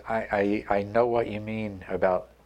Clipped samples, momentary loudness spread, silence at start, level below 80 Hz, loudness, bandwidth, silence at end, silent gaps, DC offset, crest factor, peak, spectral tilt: under 0.1%; 9 LU; 0 s; -52 dBFS; -27 LUFS; 9.4 kHz; 0.2 s; none; under 0.1%; 18 dB; -10 dBFS; -8 dB/octave